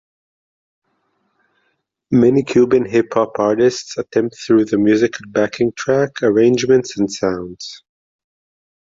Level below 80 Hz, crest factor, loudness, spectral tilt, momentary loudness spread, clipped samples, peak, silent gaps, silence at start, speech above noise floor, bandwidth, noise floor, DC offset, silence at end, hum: -54 dBFS; 14 dB; -16 LUFS; -6 dB/octave; 8 LU; under 0.1%; -2 dBFS; none; 2.1 s; 52 dB; 7.8 kHz; -68 dBFS; under 0.1%; 1.25 s; none